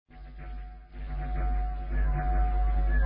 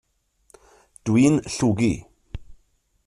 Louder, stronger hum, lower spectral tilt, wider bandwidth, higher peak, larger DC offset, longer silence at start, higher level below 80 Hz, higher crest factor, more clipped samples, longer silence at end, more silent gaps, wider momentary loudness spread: second, -31 LUFS vs -21 LUFS; neither; first, -11 dB/octave vs -6 dB/octave; second, 3.6 kHz vs 11.5 kHz; second, -18 dBFS vs -6 dBFS; neither; second, 0.1 s vs 1.05 s; first, -28 dBFS vs -46 dBFS; second, 10 dB vs 18 dB; neither; second, 0 s vs 0.55 s; neither; second, 16 LU vs 24 LU